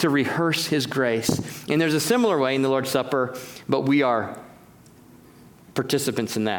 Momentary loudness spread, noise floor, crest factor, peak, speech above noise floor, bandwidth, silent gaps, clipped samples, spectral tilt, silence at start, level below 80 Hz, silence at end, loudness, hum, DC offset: 9 LU; -50 dBFS; 18 dB; -4 dBFS; 27 dB; over 20 kHz; none; under 0.1%; -4.5 dB/octave; 0 s; -62 dBFS; 0 s; -23 LUFS; none; under 0.1%